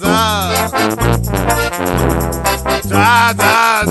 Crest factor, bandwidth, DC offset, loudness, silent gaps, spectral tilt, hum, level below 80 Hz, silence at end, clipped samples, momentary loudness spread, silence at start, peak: 12 dB; 14 kHz; under 0.1%; -13 LUFS; none; -4 dB/octave; none; -26 dBFS; 0 s; under 0.1%; 6 LU; 0 s; 0 dBFS